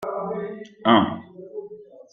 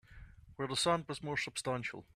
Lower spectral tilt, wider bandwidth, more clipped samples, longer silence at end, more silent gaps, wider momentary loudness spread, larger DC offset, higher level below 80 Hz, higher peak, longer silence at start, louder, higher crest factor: first, -7 dB/octave vs -3.5 dB/octave; second, 6.4 kHz vs 15 kHz; neither; about the same, 0.15 s vs 0.15 s; neither; first, 21 LU vs 9 LU; neither; about the same, -64 dBFS vs -62 dBFS; first, -2 dBFS vs -18 dBFS; about the same, 0 s vs 0.1 s; first, -22 LUFS vs -36 LUFS; about the same, 22 dB vs 20 dB